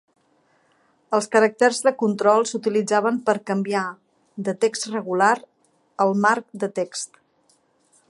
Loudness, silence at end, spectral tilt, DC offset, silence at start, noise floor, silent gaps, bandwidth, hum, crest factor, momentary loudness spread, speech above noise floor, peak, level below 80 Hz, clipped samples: -21 LUFS; 1.05 s; -4.5 dB/octave; under 0.1%; 1.1 s; -63 dBFS; none; 11.5 kHz; none; 20 dB; 11 LU; 42 dB; -2 dBFS; -78 dBFS; under 0.1%